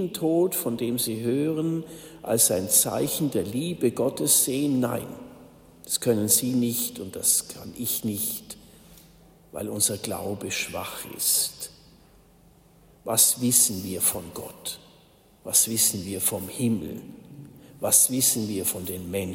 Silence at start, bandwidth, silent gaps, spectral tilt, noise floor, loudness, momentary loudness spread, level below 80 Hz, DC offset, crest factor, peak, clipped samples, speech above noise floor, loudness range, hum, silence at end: 0 s; 16.5 kHz; none; -3 dB/octave; -56 dBFS; -23 LUFS; 18 LU; -60 dBFS; under 0.1%; 24 dB; -2 dBFS; under 0.1%; 31 dB; 5 LU; none; 0 s